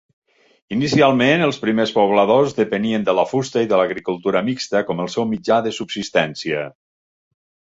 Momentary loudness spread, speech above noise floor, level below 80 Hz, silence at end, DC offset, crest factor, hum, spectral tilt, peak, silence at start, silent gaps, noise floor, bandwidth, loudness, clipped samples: 9 LU; over 72 dB; -58 dBFS; 1.05 s; under 0.1%; 16 dB; none; -5.5 dB/octave; -2 dBFS; 0.7 s; none; under -90 dBFS; 8 kHz; -18 LUFS; under 0.1%